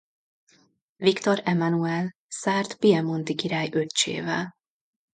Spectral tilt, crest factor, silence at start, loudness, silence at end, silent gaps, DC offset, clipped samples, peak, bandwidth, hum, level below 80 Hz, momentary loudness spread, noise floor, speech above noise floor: -4.5 dB/octave; 20 dB; 1 s; -25 LUFS; 0.65 s; 2.15-2.29 s; under 0.1%; under 0.1%; -6 dBFS; 9.6 kHz; none; -70 dBFS; 8 LU; -63 dBFS; 39 dB